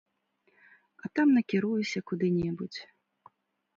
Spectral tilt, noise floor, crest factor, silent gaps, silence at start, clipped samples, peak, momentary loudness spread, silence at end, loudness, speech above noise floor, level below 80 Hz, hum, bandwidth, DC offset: -6.5 dB/octave; -72 dBFS; 16 dB; none; 1.05 s; under 0.1%; -14 dBFS; 16 LU; 0.9 s; -29 LUFS; 44 dB; -66 dBFS; none; 7.6 kHz; under 0.1%